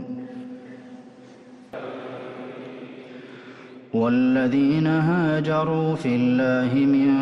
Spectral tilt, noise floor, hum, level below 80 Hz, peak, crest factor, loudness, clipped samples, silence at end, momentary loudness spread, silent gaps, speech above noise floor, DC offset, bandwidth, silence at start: -8.5 dB/octave; -46 dBFS; none; -62 dBFS; -10 dBFS; 12 dB; -21 LUFS; under 0.1%; 0 s; 22 LU; none; 26 dB; under 0.1%; 7.4 kHz; 0 s